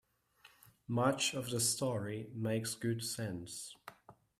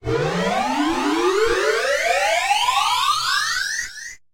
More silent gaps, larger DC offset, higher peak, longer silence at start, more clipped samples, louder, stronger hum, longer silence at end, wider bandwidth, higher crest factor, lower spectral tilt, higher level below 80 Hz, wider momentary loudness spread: neither; neither; second, -18 dBFS vs -6 dBFS; first, 0.45 s vs 0 s; neither; second, -36 LUFS vs -19 LUFS; neither; about the same, 0.25 s vs 0.15 s; about the same, 16 kHz vs 16.5 kHz; first, 22 dB vs 14 dB; about the same, -4 dB/octave vs -3 dB/octave; second, -72 dBFS vs -46 dBFS; first, 16 LU vs 4 LU